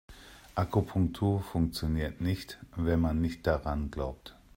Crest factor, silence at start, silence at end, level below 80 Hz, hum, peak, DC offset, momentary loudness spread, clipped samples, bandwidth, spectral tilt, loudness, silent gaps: 18 dB; 0.1 s; 0.25 s; -44 dBFS; none; -12 dBFS; under 0.1%; 10 LU; under 0.1%; 16 kHz; -7.5 dB/octave; -32 LUFS; none